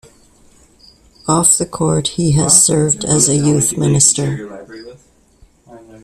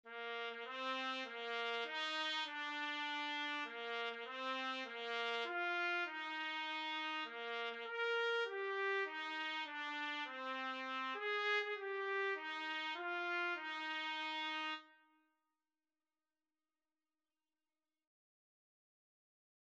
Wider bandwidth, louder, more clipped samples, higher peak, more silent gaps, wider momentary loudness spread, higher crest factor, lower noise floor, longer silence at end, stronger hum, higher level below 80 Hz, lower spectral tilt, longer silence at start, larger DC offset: first, over 20 kHz vs 8.8 kHz; first, -12 LUFS vs -41 LUFS; neither; first, 0 dBFS vs -26 dBFS; neither; first, 15 LU vs 5 LU; about the same, 16 dB vs 16 dB; second, -49 dBFS vs under -90 dBFS; second, 0.05 s vs 4.7 s; neither; first, -44 dBFS vs under -90 dBFS; first, -4 dB/octave vs -0.5 dB/octave; first, 1.25 s vs 0.05 s; neither